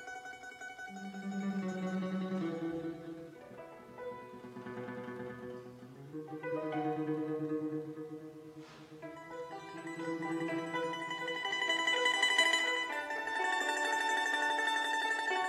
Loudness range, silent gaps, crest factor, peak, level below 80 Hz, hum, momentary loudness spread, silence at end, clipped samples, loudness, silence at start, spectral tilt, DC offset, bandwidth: 13 LU; none; 22 dB; -16 dBFS; -78 dBFS; none; 19 LU; 0 s; under 0.1%; -35 LUFS; 0 s; -3.5 dB/octave; under 0.1%; 16 kHz